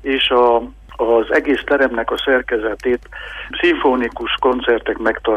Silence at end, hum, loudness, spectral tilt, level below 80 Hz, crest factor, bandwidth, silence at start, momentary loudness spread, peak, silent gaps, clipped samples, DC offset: 0 s; none; -17 LUFS; -5 dB/octave; -40 dBFS; 14 dB; 9.8 kHz; 0.05 s; 8 LU; -4 dBFS; none; under 0.1%; under 0.1%